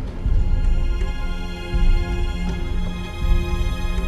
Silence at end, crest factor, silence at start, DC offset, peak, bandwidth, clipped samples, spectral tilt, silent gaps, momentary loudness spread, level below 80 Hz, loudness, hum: 0 s; 12 dB; 0 s; under 0.1%; -6 dBFS; 7.8 kHz; under 0.1%; -6.5 dB/octave; none; 6 LU; -20 dBFS; -25 LUFS; none